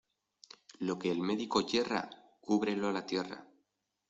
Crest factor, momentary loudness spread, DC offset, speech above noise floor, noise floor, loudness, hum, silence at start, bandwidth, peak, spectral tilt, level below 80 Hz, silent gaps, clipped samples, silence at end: 20 dB; 19 LU; under 0.1%; 48 dB; -82 dBFS; -34 LUFS; none; 0.8 s; 8.2 kHz; -16 dBFS; -5 dB/octave; -72 dBFS; none; under 0.1%; 0.65 s